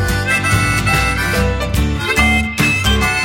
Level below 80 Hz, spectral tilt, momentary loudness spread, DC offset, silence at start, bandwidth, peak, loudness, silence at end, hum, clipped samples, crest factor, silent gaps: -22 dBFS; -4 dB/octave; 4 LU; under 0.1%; 0 s; 17 kHz; 0 dBFS; -14 LUFS; 0 s; none; under 0.1%; 14 dB; none